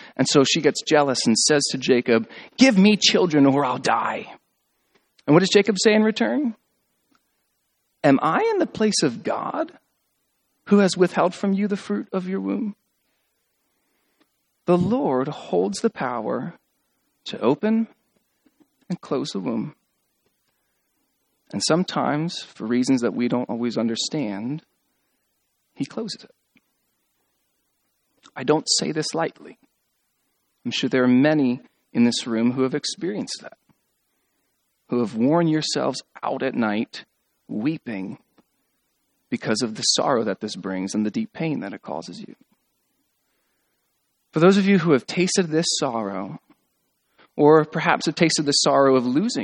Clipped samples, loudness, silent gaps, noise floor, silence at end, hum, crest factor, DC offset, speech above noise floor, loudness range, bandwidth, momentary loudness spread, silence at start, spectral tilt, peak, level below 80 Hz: under 0.1%; -21 LUFS; none; -72 dBFS; 0 s; none; 22 dB; under 0.1%; 51 dB; 10 LU; 11 kHz; 15 LU; 0 s; -4.5 dB/octave; 0 dBFS; -68 dBFS